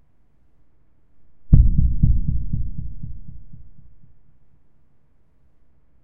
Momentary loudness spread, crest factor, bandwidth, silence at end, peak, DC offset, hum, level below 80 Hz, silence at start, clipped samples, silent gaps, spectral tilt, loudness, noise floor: 25 LU; 22 dB; 1.2 kHz; 0 s; 0 dBFS; under 0.1%; none; -24 dBFS; 0 s; under 0.1%; none; -15.5 dB/octave; -21 LUFS; -60 dBFS